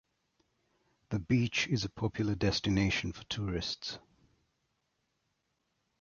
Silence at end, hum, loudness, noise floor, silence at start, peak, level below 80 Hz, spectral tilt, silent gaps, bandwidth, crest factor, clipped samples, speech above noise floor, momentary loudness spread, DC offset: 2 s; none; -33 LUFS; -80 dBFS; 1.1 s; -16 dBFS; -52 dBFS; -5 dB/octave; none; 7.4 kHz; 20 dB; under 0.1%; 48 dB; 9 LU; under 0.1%